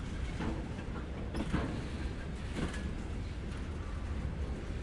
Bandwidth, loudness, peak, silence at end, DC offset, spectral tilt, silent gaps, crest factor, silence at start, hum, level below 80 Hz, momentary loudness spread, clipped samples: 11.5 kHz; -40 LUFS; -20 dBFS; 0 s; under 0.1%; -6.5 dB/octave; none; 18 dB; 0 s; none; -42 dBFS; 5 LU; under 0.1%